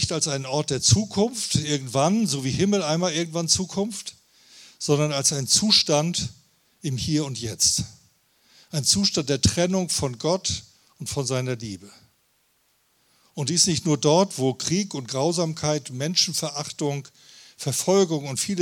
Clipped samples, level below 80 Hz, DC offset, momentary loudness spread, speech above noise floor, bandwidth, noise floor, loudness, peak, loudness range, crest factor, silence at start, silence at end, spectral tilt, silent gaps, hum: under 0.1%; -50 dBFS; under 0.1%; 12 LU; 43 dB; 19 kHz; -66 dBFS; -23 LUFS; -6 dBFS; 4 LU; 18 dB; 0 s; 0 s; -3.5 dB/octave; none; none